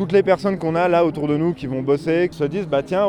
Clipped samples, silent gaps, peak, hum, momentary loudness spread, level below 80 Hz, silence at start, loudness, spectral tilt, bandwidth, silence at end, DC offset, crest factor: under 0.1%; none; -4 dBFS; none; 6 LU; -50 dBFS; 0 s; -20 LUFS; -7.5 dB/octave; 11.5 kHz; 0 s; under 0.1%; 14 dB